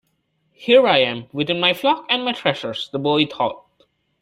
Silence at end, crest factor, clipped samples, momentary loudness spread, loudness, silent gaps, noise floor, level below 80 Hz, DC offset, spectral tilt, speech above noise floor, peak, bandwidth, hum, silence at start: 0.65 s; 20 dB; under 0.1%; 11 LU; -19 LUFS; none; -68 dBFS; -64 dBFS; under 0.1%; -5.5 dB/octave; 49 dB; 0 dBFS; 16 kHz; none; 0.6 s